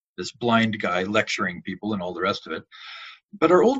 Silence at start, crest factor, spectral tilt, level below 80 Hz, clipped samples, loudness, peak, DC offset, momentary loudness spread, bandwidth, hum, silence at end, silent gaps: 0.2 s; 20 dB; -5 dB/octave; -62 dBFS; under 0.1%; -24 LUFS; -4 dBFS; under 0.1%; 18 LU; 8.2 kHz; none; 0 s; 3.25-3.29 s